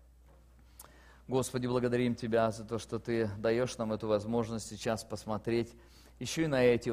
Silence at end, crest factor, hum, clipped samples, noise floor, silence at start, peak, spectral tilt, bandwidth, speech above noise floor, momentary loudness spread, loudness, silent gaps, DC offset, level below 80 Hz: 0 s; 20 dB; none; under 0.1%; -59 dBFS; 0.8 s; -14 dBFS; -5.5 dB/octave; 15.5 kHz; 27 dB; 9 LU; -33 LUFS; none; under 0.1%; -58 dBFS